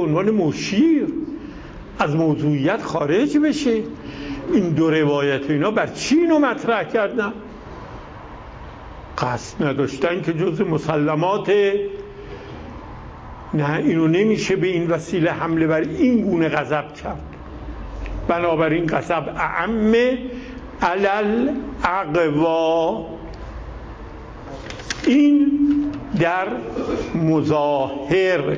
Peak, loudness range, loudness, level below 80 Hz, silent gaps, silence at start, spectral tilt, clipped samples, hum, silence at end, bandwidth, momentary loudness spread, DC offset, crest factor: -4 dBFS; 4 LU; -20 LUFS; -42 dBFS; none; 0 s; -6.5 dB/octave; under 0.1%; none; 0 s; 8 kHz; 19 LU; under 0.1%; 16 dB